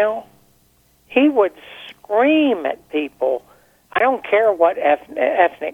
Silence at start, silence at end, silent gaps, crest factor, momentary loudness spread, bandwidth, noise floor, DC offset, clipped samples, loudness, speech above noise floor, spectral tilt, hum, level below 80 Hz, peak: 0 s; 0 s; none; 18 dB; 11 LU; 13.5 kHz; -57 dBFS; under 0.1%; under 0.1%; -18 LUFS; 40 dB; -5.5 dB/octave; none; -62 dBFS; -2 dBFS